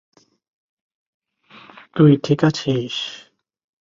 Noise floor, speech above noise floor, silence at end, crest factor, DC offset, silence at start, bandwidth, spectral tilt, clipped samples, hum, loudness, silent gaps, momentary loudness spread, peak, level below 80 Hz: -47 dBFS; 31 dB; 0.65 s; 20 dB; under 0.1%; 1.95 s; 7.6 kHz; -7 dB/octave; under 0.1%; none; -18 LUFS; none; 16 LU; -2 dBFS; -60 dBFS